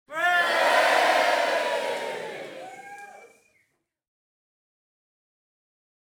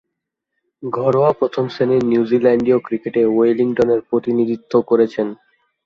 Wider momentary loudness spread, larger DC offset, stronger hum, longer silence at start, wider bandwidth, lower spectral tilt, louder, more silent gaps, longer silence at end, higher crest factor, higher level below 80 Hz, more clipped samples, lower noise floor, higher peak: first, 22 LU vs 6 LU; neither; neither; second, 0.1 s vs 0.8 s; first, 19 kHz vs 7 kHz; second, -1 dB/octave vs -8.5 dB/octave; second, -22 LUFS vs -17 LUFS; neither; first, 2.75 s vs 0.5 s; about the same, 18 dB vs 14 dB; second, -80 dBFS vs -58 dBFS; neither; second, -73 dBFS vs -78 dBFS; second, -8 dBFS vs -2 dBFS